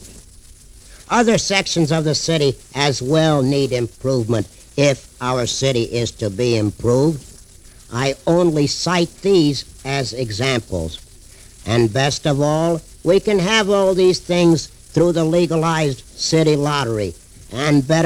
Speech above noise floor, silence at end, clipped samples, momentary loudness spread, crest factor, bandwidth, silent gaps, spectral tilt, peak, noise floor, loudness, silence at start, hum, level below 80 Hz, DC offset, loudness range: 26 dB; 0 s; under 0.1%; 8 LU; 18 dB; 16 kHz; none; -5 dB/octave; 0 dBFS; -43 dBFS; -18 LUFS; 0 s; none; -42 dBFS; under 0.1%; 4 LU